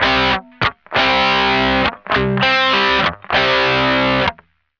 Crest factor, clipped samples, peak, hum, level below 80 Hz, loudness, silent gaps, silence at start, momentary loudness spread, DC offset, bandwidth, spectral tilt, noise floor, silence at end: 14 dB; under 0.1%; -2 dBFS; none; -38 dBFS; -15 LUFS; none; 0 s; 5 LU; under 0.1%; 5.4 kHz; -5 dB/octave; -38 dBFS; 0.45 s